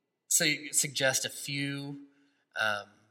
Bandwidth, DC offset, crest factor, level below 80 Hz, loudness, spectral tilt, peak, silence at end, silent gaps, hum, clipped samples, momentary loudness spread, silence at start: 16.5 kHz; under 0.1%; 22 dB; -82 dBFS; -29 LUFS; -1.5 dB/octave; -12 dBFS; 0.25 s; none; none; under 0.1%; 15 LU; 0.3 s